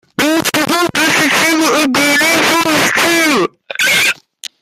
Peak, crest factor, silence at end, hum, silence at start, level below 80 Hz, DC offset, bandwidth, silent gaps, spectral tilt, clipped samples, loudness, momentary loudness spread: 0 dBFS; 12 dB; 0.5 s; none; 0.2 s; -54 dBFS; under 0.1%; 16 kHz; none; -2 dB/octave; under 0.1%; -11 LUFS; 5 LU